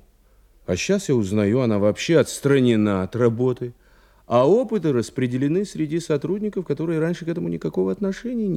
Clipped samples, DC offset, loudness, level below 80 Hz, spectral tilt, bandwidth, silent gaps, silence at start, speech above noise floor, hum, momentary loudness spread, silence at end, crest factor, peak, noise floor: under 0.1%; under 0.1%; -22 LUFS; -56 dBFS; -6.5 dB/octave; 15 kHz; none; 0.7 s; 35 dB; none; 8 LU; 0 s; 16 dB; -6 dBFS; -55 dBFS